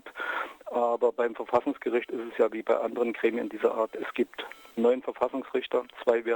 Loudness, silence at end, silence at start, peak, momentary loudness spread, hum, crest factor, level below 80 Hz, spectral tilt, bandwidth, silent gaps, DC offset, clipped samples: -29 LUFS; 0 s; 0.05 s; -12 dBFS; 6 LU; none; 16 dB; -72 dBFS; -5.5 dB/octave; 19 kHz; none; under 0.1%; under 0.1%